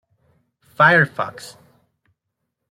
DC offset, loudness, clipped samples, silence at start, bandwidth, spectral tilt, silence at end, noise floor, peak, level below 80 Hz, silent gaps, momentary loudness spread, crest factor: under 0.1%; -16 LUFS; under 0.1%; 0.8 s; 15 kHz; -5.5 dB/octave; 1.2 s; -78 dBFS; -2 dBFS; -64 dBFS; none; 25 LU; 20 dB